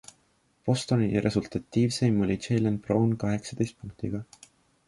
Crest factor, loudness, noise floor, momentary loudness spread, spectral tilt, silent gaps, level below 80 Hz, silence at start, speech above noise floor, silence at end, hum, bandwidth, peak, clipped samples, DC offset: 16 dB; -28 LUFS; -68 dBFS; 10 LU; -6.5 dB/octave; none; -54 dBFS; 0.65 s; 41 dB; 0.65 s; none; 11.5 kHz; -10 dBFS; under 0.1%; under 0.1%